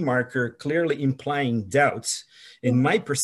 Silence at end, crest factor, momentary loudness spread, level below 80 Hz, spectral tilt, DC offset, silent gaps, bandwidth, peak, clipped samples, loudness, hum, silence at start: 0 s; 16 dB; 7 LU; -68 dBFS; -5 dB/octave; under 0.1%; none; 12.5 kHz; -8 dBFS; under 0.1%; -24 LUFS; none; 0 s